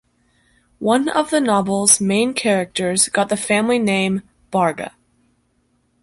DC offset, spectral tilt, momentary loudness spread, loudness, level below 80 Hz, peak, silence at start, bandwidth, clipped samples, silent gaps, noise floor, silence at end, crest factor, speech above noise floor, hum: under 0.1%; -3.5 dB/octave; 10 LU; -17 LUFS; -58 dBFS; 0 dBFS; 0.8 s; 12 kHz; under 0.1%; none; -64 dBFS; 1.15 s; 20 dB; 46 dB; none